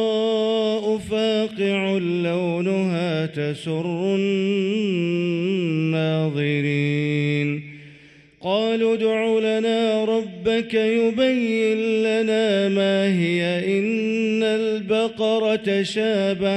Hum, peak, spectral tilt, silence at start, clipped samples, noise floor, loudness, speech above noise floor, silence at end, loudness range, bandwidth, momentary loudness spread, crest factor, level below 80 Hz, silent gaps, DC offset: none; -8 dBFS; -6.5 dB/octave; 0 s; under 0.1%; -49 dBFS; -21 LUFS; 28 dB; 0 s; 3 LU; 11 kHz; 4 LU; 14 dB; -62 dBFS; none; under 0.1%